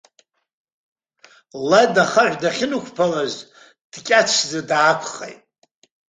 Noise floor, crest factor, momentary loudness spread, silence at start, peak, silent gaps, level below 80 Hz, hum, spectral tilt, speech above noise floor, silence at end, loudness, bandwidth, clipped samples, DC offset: -61 dBFS; 20 dB; 19 LU; 1.55 s; -2 dBFS; 3.81-3.90 s; -66 dBFS; none; -3 dB/octave; 43 dB; 0.8 s; -18 LUFS; 9.6 kHz; under 0.1%; under 0.1%